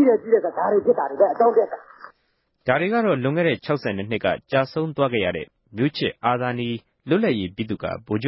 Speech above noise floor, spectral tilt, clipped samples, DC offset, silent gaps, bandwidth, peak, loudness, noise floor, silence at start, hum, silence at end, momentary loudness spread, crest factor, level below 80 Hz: 48 dB; -11 dB/octave; under 0.1%; under 0.1%; none; 5.8 kHz; -4 dBFS; -22 LUFS; -69 dBFS; 0 s; none; 0 s; 10 LU; 16 dB; -54 dBFS